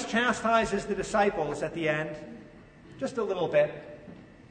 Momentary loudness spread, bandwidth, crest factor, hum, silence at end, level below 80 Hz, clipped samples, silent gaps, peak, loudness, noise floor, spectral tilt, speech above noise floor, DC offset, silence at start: 20 LU; 9.6 kHz; 18 dB; none; 0.05 s; -56 dBFS; under 0.1%; none; -12 dBFS; -28 LUFS; -51 dBFS; -4.5 dB/octave; 23 dB; under 0.1%; 0 s